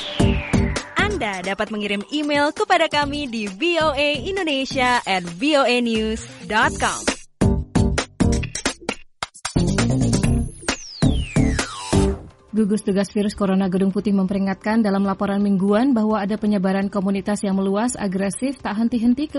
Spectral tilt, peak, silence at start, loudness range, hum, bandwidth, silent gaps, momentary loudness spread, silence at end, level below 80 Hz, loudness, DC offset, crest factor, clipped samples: -5 dB/octave; -6 dBFS; 0 s; 2 LU; none; 11.5 kHz; none; 7 LU; 0 s; -32 dBFS; -21 LUFS; under 0.1%; 14 dB; under 0.1%